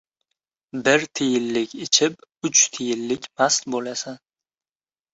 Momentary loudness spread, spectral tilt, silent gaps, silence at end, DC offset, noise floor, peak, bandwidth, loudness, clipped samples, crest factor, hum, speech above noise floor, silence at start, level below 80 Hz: 13 LU; -1.5 dB/octave; none; 0.95 s; under 0.1%; under -90 dBFS; -2 dBFS; 8.2 kHz; -21 LUFS; under 0.1%; 22 dB; none; over 68 dB; 0.75 s; -68 dBFS